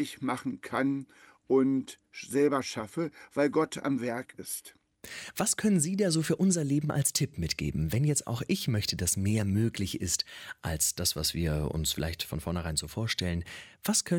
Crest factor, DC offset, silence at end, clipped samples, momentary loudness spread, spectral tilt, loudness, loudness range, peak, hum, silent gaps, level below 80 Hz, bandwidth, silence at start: 16 dB; under 0.1%; 0 s; under 0.1%; 10 LU; -4.5 dB/octave; -30 LUFS; 3 LU; -14 dBFS; none; none; -48 dBFS; 17.5 kHz; 0 s